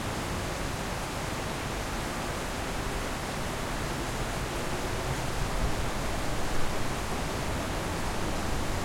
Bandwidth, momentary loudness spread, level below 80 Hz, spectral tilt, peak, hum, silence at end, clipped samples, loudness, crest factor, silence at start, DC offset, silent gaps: 16.5 kHz; 1 LU; -38 dBFS; -4 dB/octave; -16 dBFS; none; 0 s; under 0.1%; -33 LUFS; 14 dB; 0 s; under 0.1%; none